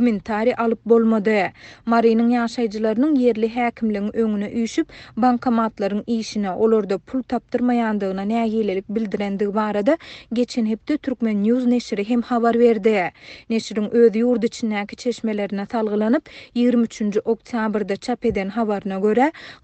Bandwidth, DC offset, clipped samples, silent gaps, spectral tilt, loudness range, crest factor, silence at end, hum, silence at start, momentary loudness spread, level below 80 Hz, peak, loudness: 8.6 kHz; under 0.1%; under 0.1%; none; -6.5 dB/octave; 3 LU; 16 dB; 0.1 s; none; 0 s; 8 LU; -54 dBFS; -4 dBFS; -21 LUFS